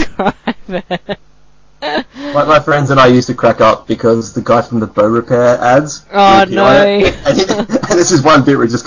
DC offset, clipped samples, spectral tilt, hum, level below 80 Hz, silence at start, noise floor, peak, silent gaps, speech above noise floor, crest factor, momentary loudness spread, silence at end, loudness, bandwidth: 0.4%; under 0.1%; -5 dB/octave; none; -36 dBFS; 0 s; -49 dBFS; 0 dBFS; none; 38 dB; 10 dB; 13 LU; 0 s; -10 LUFS; 7.6 kHz